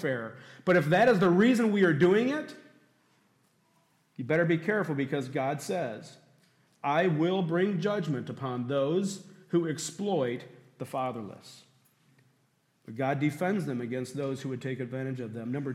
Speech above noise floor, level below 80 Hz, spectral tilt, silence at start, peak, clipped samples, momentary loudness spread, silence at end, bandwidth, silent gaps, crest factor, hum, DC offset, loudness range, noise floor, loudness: 42 dB; -74 dBFS; -6.5 dB/octave; 0 s; -14 dBFS; under 0.1%; 14 LU; 0 s; 14.5 kHz; none; 16 dB; none; under 0.1%; 9 LU; -71 dBFS; -29 LUFS